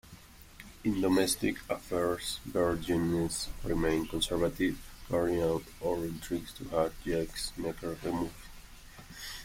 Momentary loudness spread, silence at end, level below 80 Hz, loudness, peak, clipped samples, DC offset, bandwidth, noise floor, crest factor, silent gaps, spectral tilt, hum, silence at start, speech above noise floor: 16 LU; 0 s; -48 dBFS; -33 LUFS; -14 dBFS; under 0.1%; under 0.1%; 16.5 kHz; -53 dBFS; 20 dB; none; -4.5 dB/octave; none; 0.05 s; 21 dB